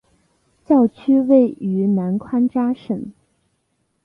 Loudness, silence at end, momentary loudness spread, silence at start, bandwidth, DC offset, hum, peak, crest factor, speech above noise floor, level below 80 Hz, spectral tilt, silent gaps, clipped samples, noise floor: -18 LUFS; 0.95 s; 12 LU; 0.7 s; 3.9 kHz; under 0.1%; none; -4 dBFS; 16 dB; 52 dB; -60 dBFS; -10.5 dB/octave; none; under 0.1%; -69 dBFS